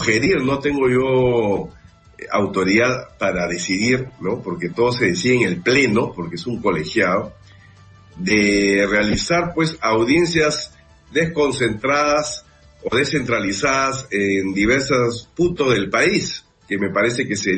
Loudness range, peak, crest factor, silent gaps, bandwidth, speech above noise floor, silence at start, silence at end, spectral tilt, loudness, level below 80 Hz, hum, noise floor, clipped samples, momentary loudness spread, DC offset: 2 LU; -4 dBFS; 16 dB; none; 8.8 kHz; 28 dB; 0 s; 0 s; -4.5 dB/octave; -18 LUFS; -44 dBFS; none; -46 dBFS; under 0.1%; 9 LU; under 0.1%